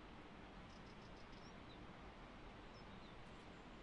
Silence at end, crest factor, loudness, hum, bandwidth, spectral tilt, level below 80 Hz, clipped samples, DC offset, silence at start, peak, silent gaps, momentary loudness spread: 0 s; 12 dB; -59 LUFS; none; 10 kHz; -5.5 dB/octave; -64 dBFS; under 0.1%; under 0.1%; 0 s; -44 dBFS; none; 1 LU